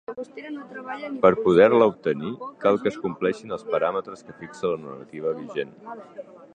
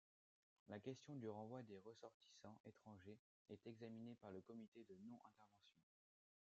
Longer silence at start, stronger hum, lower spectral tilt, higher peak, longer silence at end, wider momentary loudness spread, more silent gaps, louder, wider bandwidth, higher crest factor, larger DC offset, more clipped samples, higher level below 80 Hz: second, 0.1 s vs 0.65 s; neither; about the same, -7 dB/octave vs -6.5 dB/octave; first, -2 dBFS vs -40 dBFS; second, 0.1 s vs 0.6 s; first, 22 LU vs 10 LU; second, none vs 2.14-2.20 s, 2.60-2.64 s, 3.19-3.45 s, 4.68-4.72 s; first, -23 LUFS vs -60 LUFS; first, 9.2 kHz vs 7.6 kHz; about the same, 22 dB vs 20 dB; neither; neither; first, -62 dBFS vs under -90 dBFS